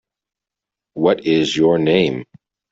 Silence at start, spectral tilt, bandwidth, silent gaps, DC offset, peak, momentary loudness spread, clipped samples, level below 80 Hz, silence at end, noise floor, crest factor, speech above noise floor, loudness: 0.95 s; -6 dB/octave; 7.8 kHz; none; under 0.1%; -2 dBFS; 10 LU; under 0.1%; -56 dBFS; 0.5 s; -86 dBFS; 18 dB; 71 dB; -16 LUFS